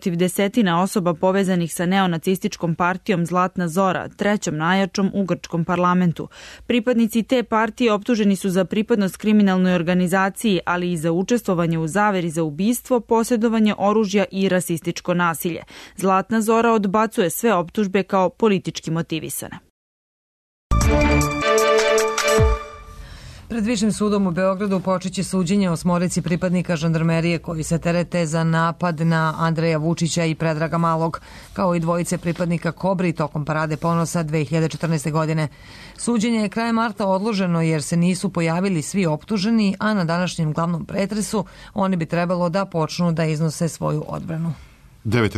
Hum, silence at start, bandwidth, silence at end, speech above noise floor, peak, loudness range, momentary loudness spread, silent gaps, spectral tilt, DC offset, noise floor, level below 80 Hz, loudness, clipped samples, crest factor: none; 0 s; 13.5 kHz; 0 s; over 70 dB; -6 dBFS; 3 LU; 7 LU; 19.70-20.70 s; -6 dB/octave; under 0.1%; under -90 dBFS; -38 dBFS; -20 LUFS; under 0.1%; 14 dB